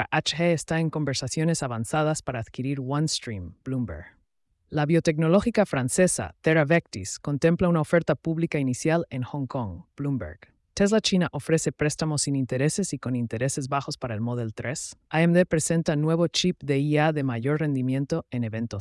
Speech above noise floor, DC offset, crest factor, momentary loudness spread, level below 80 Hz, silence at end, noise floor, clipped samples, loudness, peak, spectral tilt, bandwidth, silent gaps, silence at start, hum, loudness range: 46 dB; under 0.1%; 16 dB; 10 LU; -54 dBFS; 0 s; -71 dBFS; under 0.1%; -25 LUFS; -10 dBFS; -5 dB/octave; 12 kHz; none; 0 s; none; 4 LU